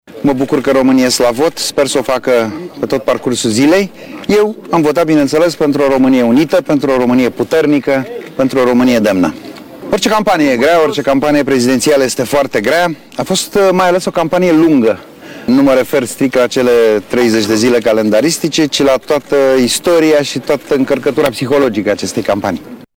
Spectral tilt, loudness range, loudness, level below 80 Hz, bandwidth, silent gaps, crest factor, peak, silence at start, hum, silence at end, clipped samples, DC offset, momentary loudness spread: -4.5 dB/octave; 2 LU; -11 LUFS; -44 dBFS; 17.5 kHz; none; 8 dB; -2 dBFS; 0.1 s; none; 0.15 s; under 0.1%; under 0.1%; 6 LU